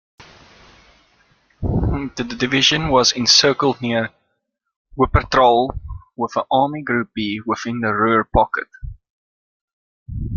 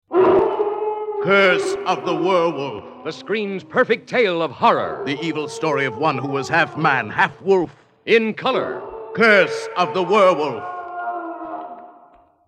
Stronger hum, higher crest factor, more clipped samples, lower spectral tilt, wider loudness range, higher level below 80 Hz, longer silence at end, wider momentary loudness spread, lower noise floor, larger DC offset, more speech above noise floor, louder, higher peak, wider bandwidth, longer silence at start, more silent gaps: neither; about the same, 20 dB vs 18 dB; neither; about the same, -4 dB/octave vs -5 dB/octave; first, 5 LU vs 2 LU; first, -34 dBFS vs -62 dBFS; second, 0 s vs 0.55 s; about the same, 17 LU vs 15 LU; first, -73 dBFS vs -51 dBFS; neither; first, 56 dB vs 32 dB; about the same, -17 LUFS vs -19 LUFS; about the same, 0 dBFS vs -2 dBFS; second, 7.4 kHz vs 10 kHz; about the same, 0.2 s vs 0.1 s; first, 4.76-4.85 s, 9.10-10.06 s vs none